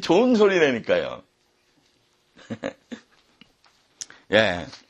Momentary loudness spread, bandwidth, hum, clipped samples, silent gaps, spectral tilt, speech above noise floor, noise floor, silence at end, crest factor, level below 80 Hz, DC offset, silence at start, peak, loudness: 24 LU; 10.5 kHz; none; under 0.1%; none; -4.5 dB/octave; 44 dB; -65 dBFS; 0.15 s; 24 dB; -60 dBFS; under 0.1%; 0 s; 0 dBFS; -21 LUFS